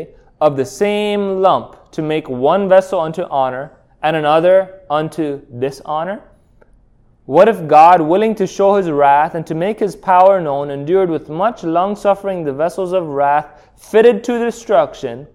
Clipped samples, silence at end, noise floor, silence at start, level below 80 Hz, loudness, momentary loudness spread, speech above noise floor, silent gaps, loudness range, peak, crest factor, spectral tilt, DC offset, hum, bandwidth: under 0.1%; 0.1 s; -51 dBFS; 0 s; -52 dBFS; -15 LUFS; 11 LU; 36 dB; none; 5 LU; 0 dBFS; 14 dB; -6 dB/octave; under 0.1%; none; 13 kHz